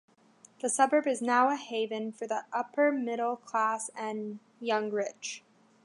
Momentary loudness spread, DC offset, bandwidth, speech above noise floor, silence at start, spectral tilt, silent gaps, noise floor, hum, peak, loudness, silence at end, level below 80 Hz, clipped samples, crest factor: 13 LU; under 0.1%; 11.5 kHz; 31 dB; 0.65 s; -3 dB/octave; none; -61 dBFS; none; -10 dBFS; -30 LUFS; 0.45 s; -88 dBFS; under 0.1%; 20 dB